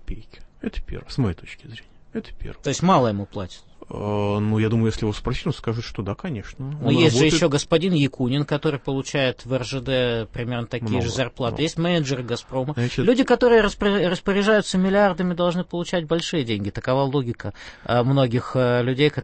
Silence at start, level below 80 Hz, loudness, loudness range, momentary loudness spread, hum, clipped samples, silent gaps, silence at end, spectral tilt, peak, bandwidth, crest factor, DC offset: 0 s; -42 dBFS; -22 LUFS; 6 LU; 15 LU; none; under 0.1%; none; 0 s; -6 dB/octave; -4 dBFS; 8.8 kHz; 18 dB; under 0.1%